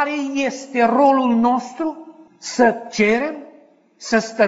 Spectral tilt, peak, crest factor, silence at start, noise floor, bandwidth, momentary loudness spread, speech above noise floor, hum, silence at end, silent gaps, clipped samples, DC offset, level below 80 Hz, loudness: -3 dB/octave; -2 dBFS; 16 dB; 0 s; -50 dBFS; 8 kHz; 15 LU; 32 dB; none; 0 s; none; under 0.1%; under 0.1%; -60 dBFS; -18 LUFS